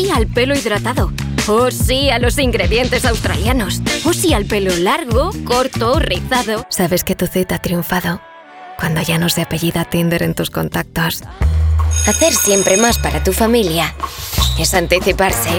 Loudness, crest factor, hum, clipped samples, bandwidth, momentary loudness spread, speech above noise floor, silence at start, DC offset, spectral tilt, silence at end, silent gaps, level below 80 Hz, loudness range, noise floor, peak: -15 LUFS; 16 dB; none; under 0.1%; over 20 kHz; 7 LU; 20 dB; 0 s; under 0.1%; -4 dB/octave; 0 s; none; -24 dBFS; 4 LU; -35 dBFS; 0 dBFS